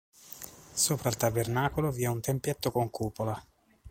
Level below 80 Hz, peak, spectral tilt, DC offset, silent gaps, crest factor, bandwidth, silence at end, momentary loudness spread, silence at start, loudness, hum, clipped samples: -54 dBFS; -12 dBFS; -4.5 dB/octave; under 0.1%; none; 18 dB; 16.5 kHz; 0 s; 16 LU; 0.25 s; -30 LUFS; none; under 0.1%